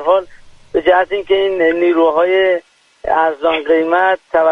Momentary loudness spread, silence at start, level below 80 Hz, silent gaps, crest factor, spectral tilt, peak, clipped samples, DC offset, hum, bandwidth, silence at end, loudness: 5 LU; 0 s; -48 dBFS; none; 14 dB; -5.5 dB/octave; 0 dBFS; under 0.1%; under 0.1%; none; 6.6 kHz; 0 s; -14 LUFS